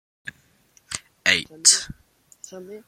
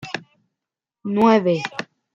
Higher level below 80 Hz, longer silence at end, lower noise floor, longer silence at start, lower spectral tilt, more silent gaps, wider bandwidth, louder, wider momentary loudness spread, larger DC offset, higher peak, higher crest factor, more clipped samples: first, -58 dBFS vs -66 dBFS; second, 0.1 s vs 0.3 s; second, -59 dBFS vs -86 dBFS; first, 0.25 s vs 0 s; second, 1 dB/octave vs -6.5 dB/octave; neither; first, 16.5 kHz vs 7.6 kHz; about the same, -18 LUFS vs -19 LUFS; first, 24 LU vs 17 LU; neither; about the same, 0 dBFS vs -2 dBFS; first, 26 dB vs 20 dB; neither